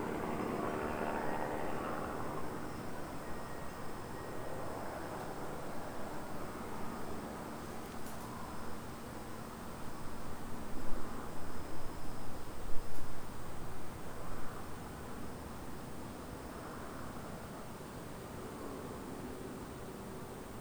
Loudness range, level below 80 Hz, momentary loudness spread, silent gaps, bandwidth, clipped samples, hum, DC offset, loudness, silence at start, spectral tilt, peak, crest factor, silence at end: 6 LU; -50 dBFS; 8 LU; none; over 20 kHz; under 0.1%; none; under 0.1%; -44 LUFS; 0 s; -5.5 dB/octave; -16 dBFS; 20 dB; 0 s